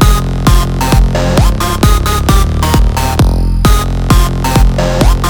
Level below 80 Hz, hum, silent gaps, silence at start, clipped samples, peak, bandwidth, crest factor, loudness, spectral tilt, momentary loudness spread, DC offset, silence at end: -10 dBFS; none; none; 0 s; 1%; 0 dBFS; over 20 kHz; 8 dB; -11 LUFS; -5.5 dB/octave; 1 LU; under 0.1%; 0 s